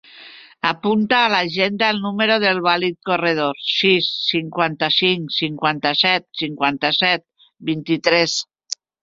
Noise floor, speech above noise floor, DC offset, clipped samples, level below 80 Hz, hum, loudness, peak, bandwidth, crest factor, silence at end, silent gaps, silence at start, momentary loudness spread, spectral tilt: -43 dBFS; 24 dB; under 0.1%; under 0.1%; -62 dBFS; none; -18 LUFS; -2 dBFS; 7.8 kHz; 18 dB; 0.3 s; none; 0.15 s; 8 LU; -4 dB/octave